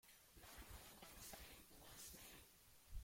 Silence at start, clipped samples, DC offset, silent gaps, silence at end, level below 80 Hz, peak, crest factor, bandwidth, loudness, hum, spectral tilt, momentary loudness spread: 0.05 s; under 0.1%; under 0.1%; none; 0 s; -64 dBFS; -40 dBFS; 20 dB; 16.5 kHz; -60 LUFS; none; -2.5 dB/octave; 8 LU